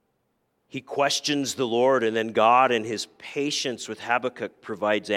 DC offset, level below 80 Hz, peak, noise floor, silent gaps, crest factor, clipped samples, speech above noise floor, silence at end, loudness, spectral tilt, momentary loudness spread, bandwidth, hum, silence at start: under 0.1%; -76 dBFS; -6 dBFS; -73 dBFS; none; 20 dB; under 0.1%; 49 dB; 0 s; -24 LUFS; -3 dB/octave; 14 LU; 16 kHz; none; 0.75 s